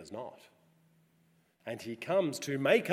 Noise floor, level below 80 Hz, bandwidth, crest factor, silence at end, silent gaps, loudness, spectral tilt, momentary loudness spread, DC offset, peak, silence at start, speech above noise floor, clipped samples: -70 dBFS; -84 dBFS; 16 kHz; 22 dB; 0 s; none; -33 LUFS; -5 dB/octave; 18 LU; under 0.1%; -12 dBFS; 0 s; 38 dB; under 0.1%